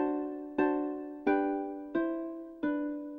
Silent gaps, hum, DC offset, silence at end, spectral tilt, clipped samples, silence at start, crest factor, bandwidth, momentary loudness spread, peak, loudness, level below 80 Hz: none; none; under 0.1%; 0 s; -8 dB/octave; under 0.1%; 0 s; 18 dB; 4.2 kHz; 7 LU; -16 dBFS; -33 LUFS; -66 dBFS